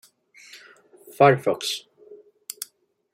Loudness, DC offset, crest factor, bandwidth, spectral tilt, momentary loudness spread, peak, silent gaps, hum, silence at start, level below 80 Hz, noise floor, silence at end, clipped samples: -21 LUFS; under 0.1%; 24 dB; 16 kHz; -4.5 dB/octave; 25 LU; -2 dBFS; none; none; 0.55 s; -74 dBFS; -58 dBFS; 1 s; under 0.1%